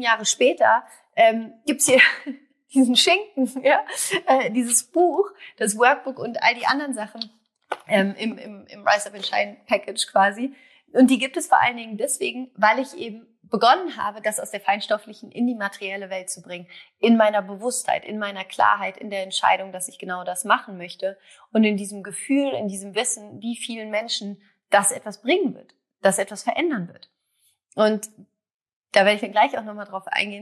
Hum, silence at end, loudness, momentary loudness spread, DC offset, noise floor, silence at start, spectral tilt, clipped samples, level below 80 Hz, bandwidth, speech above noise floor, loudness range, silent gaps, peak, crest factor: none; 0 s; -22 LUFS; 14 LU; under 0.1%; -67 dBFS; 0 s; -2.5 dB/octave; under 0.1%; -80 dBFS; 13.5 kHz; 45 dB; 6 LU; 28.54-28.60 s, 28.76-28.82 s; -2 dBFS; 20 dB